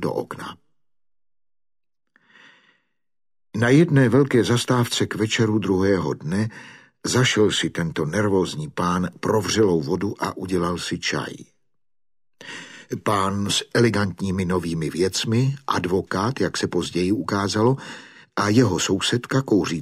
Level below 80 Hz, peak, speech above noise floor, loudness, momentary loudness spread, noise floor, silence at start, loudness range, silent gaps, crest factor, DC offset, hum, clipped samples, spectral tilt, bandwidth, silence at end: -56 dBFS; -4 dBFS; 45 dB; -21 LUFS; 12 LU; -66 dBFS; 0 s; 6 LU; none; 18 dB; under 0.1%; none; under 0.1%; -5 dB/octave; 15 kHz; 0 s